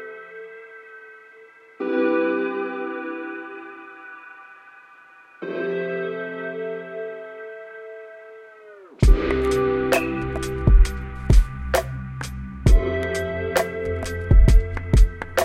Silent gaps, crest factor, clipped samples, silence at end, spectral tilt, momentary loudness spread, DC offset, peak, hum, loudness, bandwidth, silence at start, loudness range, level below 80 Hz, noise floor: none; 18 dB; under 0.1%; 0 s; -6.5 dB/octave; 21 LU; under 0.1%; -2 dBFS; none; -23 LUFS; 15 kHz; 0 s; 10 LU; -24 dBFS; -49 dBFS